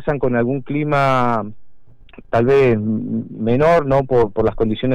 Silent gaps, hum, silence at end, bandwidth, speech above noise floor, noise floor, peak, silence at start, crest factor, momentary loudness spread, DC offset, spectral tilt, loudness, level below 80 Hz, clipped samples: none; none; 0 s; 9.8 kHz; 26 dB; -42 dBFS; -6 dBFS; 0 s; 10 dB; 9 LU; under 0.1%; -8.5 dB/octave; -17 LUFS; -38 dBFS; under 0.1%